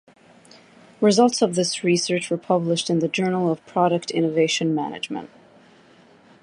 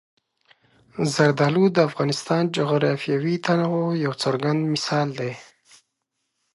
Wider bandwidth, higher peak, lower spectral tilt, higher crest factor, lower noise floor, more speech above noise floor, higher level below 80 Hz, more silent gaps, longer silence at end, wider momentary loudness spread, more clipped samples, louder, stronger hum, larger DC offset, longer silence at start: about the same, 11.5 kHz vs 11.5 kHz; about the same, -4 dBFS vs -4 dBFS; second, -4.5 dB/octave vs -6 dB/octave; about the same, 18 dB vs 20 dB; second, -52 dBFS vs -78 dBFS; second, 31 dB vs 56 dB; about the same, -70 dBFS vs -68 dBFS; neither; about the same, 1.15 s vs 1.1 s; about the same, 8 LU vs 8 LU; neither; about the same, -21 LUFS vs -22 LUFS; neither; neither; about the same, 1 s vs 0.95 s